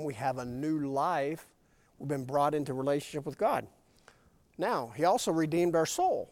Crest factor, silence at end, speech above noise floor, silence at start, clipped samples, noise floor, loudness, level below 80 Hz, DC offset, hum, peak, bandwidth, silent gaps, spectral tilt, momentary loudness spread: 16 dB; 0.05 s; 31 dB; 0 s; under 0.1%; -62 dBFS; -31 LUFS; -66 dBFS; under 0.1%; none; -14 dBFS; 16.5 kHz; none; -5.5 dB/octave; 9 LU